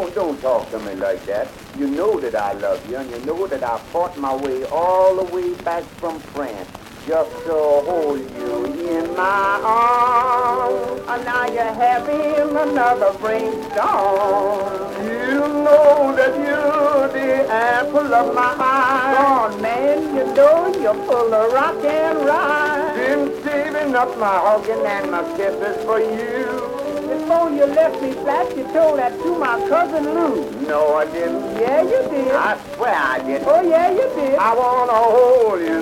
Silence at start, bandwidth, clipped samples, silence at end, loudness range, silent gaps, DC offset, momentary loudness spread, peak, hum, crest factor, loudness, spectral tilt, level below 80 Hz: 0 s; 16.5 kHz; under 0.1%; 0 s; 5 LU; none; under 0.1%; 9 LU; 0 dBFS; none; 18 dB; -18 LUFS; -5 dB/octave; -52 dBFS